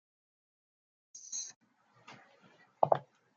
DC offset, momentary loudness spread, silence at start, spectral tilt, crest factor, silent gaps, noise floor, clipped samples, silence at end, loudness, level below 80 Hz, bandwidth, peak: under 0.1%; 25 LU; 1.15 s; -3.5 dB/octave; 30 dB; 1.56-1.61 s; -65 dBFS; under 0.1%; 0.35 s; -35 LUFS; -88 dBFS; 10 kHz; -10 dBFS